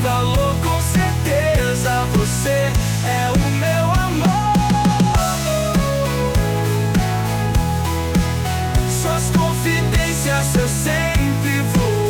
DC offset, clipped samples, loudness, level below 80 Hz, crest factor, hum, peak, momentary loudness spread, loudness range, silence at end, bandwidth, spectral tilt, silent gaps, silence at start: under 0.1%; under 0.1%; -18 LUFS; -26 dBFS; 10 dB; none; -6 dBFS; 3 LU; 2 LU; 0 s; 19.5 kHz; -5 dB/octave; none; 0 s